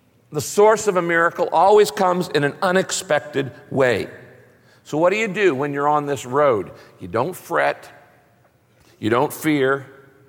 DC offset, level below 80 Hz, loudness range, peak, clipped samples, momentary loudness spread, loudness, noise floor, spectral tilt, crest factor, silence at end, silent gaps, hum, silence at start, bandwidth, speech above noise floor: under 0.1%; -64 dBFS; 6 LU; -4 dBFS; under 0.1%; 11 LU; -19 LUFS; -57 dBFS; -4.5 dB/octave; 16 dB; 0.4 s; none; none; 0.3 s; 17 kHz; 38 dB